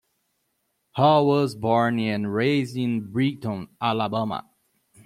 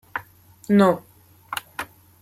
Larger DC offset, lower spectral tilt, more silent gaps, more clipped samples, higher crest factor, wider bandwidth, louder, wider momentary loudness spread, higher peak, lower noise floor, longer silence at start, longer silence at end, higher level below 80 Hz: neither; about the same, -7 dB/octave vs -6.5 dB/octave; neither; neither; about the same, 20 dB vs 20 dB; about the same, 14.5 kHz vs 15.5 kHz; about the same, -23 LUFS vs -22 LUFS; second, 12 LU vs 19 LU; about the same, -4 dBFS vs -6 dBFS; first, -74 dBFS vs -46 dBFS; first, 0.95 s vs 0.15 s; first, 0.65 s vs 0.35 s; about the same, -64 dBFS vs -64 dBFS